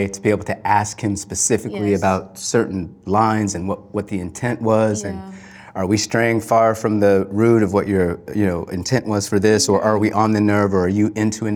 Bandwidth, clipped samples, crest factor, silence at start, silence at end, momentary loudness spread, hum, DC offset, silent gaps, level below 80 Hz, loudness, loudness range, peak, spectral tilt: 17 kHz; under 0.1%; 16 dB; 0 s; 0 s; 9 LU; none; under 0.1%; none; -50 dBFS; -18 LUFS; 3 LU; -2 dBFS; -5 dB/octave